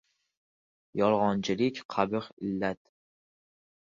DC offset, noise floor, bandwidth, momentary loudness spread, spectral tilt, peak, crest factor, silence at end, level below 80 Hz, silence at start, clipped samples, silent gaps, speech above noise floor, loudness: under 0.1%; under -90 dBFS; 7.4 kHz; 9 LU; -6 dB/octave; -8 dBFS; 22 dB; 1.15 s; -66 dBFS; 0.95 s; under 0.1%; 1.85-1.89 s, 2.33-2.37 s; over 61 dB; -30 LUFS